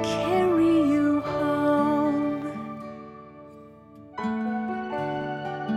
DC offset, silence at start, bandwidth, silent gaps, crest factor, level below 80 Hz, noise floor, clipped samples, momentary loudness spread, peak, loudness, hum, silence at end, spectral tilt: under 0.1%; 0 s; 12.5 kHz; none; 14 dB; -58 dBFS; -47 dBFS; under 0.1%; 19 LU; -12 dBFS; -25 LUFS; none; 0 s; -6.5 dB/octave